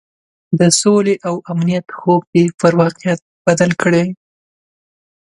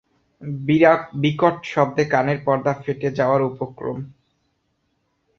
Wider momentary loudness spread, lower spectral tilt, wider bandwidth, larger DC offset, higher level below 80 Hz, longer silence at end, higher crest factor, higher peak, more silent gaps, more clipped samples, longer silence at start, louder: second, 9 LU vs 14 LU; second, -5 dB/octave vs -7.5 dB/octave; first, 11.5 kHz vs 7 kHz; neither; about the same, -56 dBFS vs -58 dBFS; second, 1.05 s vs 1.25 s; about the same, 16 dB vs 20 dB; about the same, 0 dBFS vs -2 dBFS; first, 2.27-2.33 s, 3.22-3.45 s vs none; neither; about the same, 0.5 s vs 0.4 s; first, -15 LUFS vs -20 LUFS